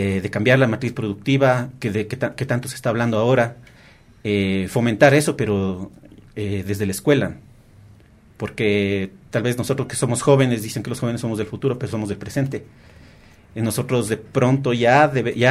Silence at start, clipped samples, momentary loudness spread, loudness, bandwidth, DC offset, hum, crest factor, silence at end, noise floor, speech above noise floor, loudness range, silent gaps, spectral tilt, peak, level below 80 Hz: 0 s; under 0.1%; 11 LU; -20 LUFS; 15 kHz; under 0.1%; none; 20 dB; 0 s; -49 dBFS; 29 dB; 5 LU; none; -6 dB/octave; 0 dBFS; -52 dBFS